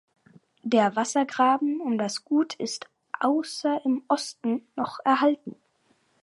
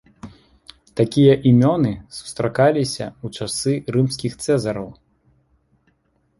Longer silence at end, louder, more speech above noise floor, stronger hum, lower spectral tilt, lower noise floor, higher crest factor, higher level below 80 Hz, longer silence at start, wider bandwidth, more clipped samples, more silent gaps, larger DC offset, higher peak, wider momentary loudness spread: second, 0.7 s vs 1.45 s; second, -26 LUFS vs -19 LUFS; second, 42 dB vs 46 dB; neither; second, -4 dB/octave vs -6.5 dB/octave; about the same, -67 dBFS vs -64 dBFS; about the same, 18 dB vs 18 dB; second, -80 dBFS vs -52 dBFS; first, 0.65 s vs 0.25 s; about the same, 11.5 kHz vs 11.5 kHz; neither; neither; neither; second, -8 dBFS vs -2 dBFS; second, 11 LU vs 16 LU